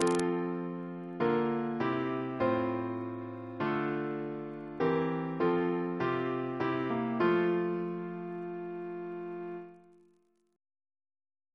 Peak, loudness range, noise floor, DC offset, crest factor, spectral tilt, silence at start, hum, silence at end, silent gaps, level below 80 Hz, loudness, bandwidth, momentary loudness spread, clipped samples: -10 dBFS; 9 LU; -70 dBFS; under 0.1%; 24 dB; -6.5 dB/octave; 0 s; none; 1.75 s; none; -72 dBFS; -33 LUFS; 11 kHz; 11 LU; under 0.1%